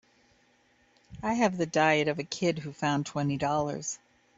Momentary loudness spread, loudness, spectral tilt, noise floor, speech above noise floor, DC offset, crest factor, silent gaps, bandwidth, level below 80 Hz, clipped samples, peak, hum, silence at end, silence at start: 11 LU; -29 LUFS; -5 dB/octave; -66 dBFS; 38 dB; under 0.1%; 20 dB; none; 8 kHz; -62 dBFS; under 0.1%; -10 dBFS; none; 0.4 s; 1.1 s